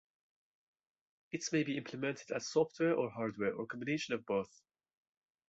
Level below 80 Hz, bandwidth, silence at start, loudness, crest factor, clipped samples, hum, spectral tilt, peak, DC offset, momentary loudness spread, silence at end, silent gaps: -78 dBFS; 8 kHz; 1.35 s; -37 LUFS; 18 dB; under 0.1%; none; -4.5 dB/octave; -20 dBFS; under 0.1%; 8 LU; 1.05 s; none